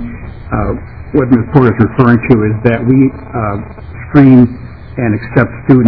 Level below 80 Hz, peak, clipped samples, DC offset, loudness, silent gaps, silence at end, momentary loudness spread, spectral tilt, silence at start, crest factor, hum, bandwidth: -30 dBFS; 0 dBFS; 3%; 1%; -11 LUFS; none; 0 s; 17 LU; -11.5 dB/octave; 0 s; 10 dB; none; 5.4 kHz